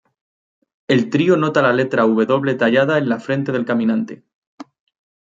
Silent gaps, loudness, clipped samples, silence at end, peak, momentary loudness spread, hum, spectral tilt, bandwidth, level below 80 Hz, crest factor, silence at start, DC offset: 4.34-4.58 s; -17 LUFS; under 0.1%; 0.7 s; -2 dBFS; 5 LU; none; -7 dB/octave; 7.6 kHz; -66 dBFS; 16 dB; 0.9 s; under 0.1%